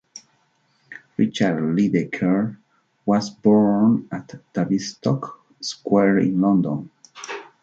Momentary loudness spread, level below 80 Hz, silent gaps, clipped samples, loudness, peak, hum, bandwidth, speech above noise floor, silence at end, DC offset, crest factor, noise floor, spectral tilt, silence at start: 17 LU; -62 dBFS; none; under 0.1%; -21 LUFS; -6 dBFS; none; 7.8 kHz; 44 dB; 0.2 s; under 0.1%; 16 dB; -64 dBFS; -6.5 dB/octave; 0.15 s